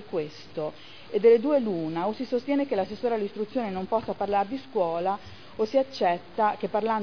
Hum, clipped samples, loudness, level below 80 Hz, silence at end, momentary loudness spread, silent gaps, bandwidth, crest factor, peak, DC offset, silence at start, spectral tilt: none; under 0.1%; -27 LUFS; -64 dBFS; 0 s; 12 LU; none; 5.4 kHz; 18 dB; -8 dBFS; 0.4%; 0 s; -7 dB/octave